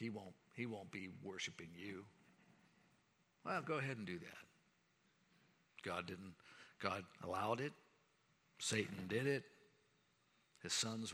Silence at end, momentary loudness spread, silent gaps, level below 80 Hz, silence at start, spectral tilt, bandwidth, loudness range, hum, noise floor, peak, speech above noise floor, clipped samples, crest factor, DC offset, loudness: 0 s; 17 LU; none; -86 dBFS; 0 s; -3.5 dB/octave; over 20 kHz; 7 LU; none; -78 dBFS; -22 dBFS; 33 dB; under 0.1%; 26 dB; under 0.1%; -45 LUFS